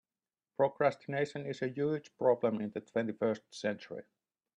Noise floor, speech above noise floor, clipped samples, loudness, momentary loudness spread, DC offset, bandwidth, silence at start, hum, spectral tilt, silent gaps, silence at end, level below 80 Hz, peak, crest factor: under -90 dBFS; over 56 dB; under 0.1%; -34 LUFS; 10 LU; under 0.1%; 10 kHz; 0.6 s; none; -6.5 dB/octave; none; 0.55 s; -80 dBFS; -16 dBFS; 20 dB